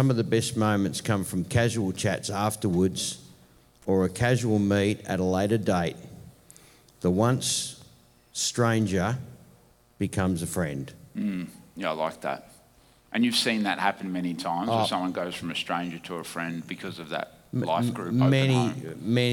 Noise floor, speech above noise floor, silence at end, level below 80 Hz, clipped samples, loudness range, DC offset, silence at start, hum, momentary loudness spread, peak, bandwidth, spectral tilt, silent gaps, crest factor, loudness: -59 dBFS; 33 dB; 0 s; -58 dBFS; under 0.1%; 5 LU; under 0.1%; 0 s; none; 12 LU; -10 dBFS; 17.5 kHz; -5 dB/octave; none; 18 dB; -27 LUFS